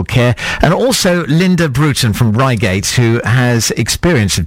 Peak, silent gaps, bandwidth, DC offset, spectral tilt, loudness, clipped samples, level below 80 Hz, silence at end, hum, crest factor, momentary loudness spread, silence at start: 0 dBFS; none; 16.5 kHz; under 0.1%; -5 dB/octave; -12 LUFS; under 0.1%; -30 dBFS; 0 s; none; 12 dB; 2 LU; 0 s